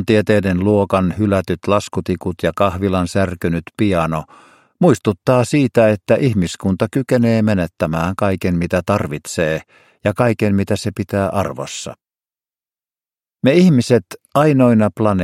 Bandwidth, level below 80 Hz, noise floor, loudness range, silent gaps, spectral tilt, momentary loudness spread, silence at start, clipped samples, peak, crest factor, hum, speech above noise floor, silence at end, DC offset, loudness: 15.5 kHz; -44 dBFS; under -90 dBFS; 4 LU; none; -7 dB/octave; 9 LU; 0 s; under 0.1%; 0 dBFS; 16 dB; none; over 74 dB; 0 s; under 0.1%; -17 LUFS